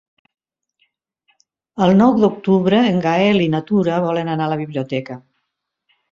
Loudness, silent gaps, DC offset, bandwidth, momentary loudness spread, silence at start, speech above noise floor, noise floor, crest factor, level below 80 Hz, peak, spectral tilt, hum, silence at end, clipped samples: -16 LUFS; none; under 0.1%; 7.2 kHz; 12 LU; 1.75 s; 60 dB; -76 dBFS; 16 dB; -56 dBFS; -2 dBFS; -7.5 dB/octave; none; 0.95 s; under 0.1%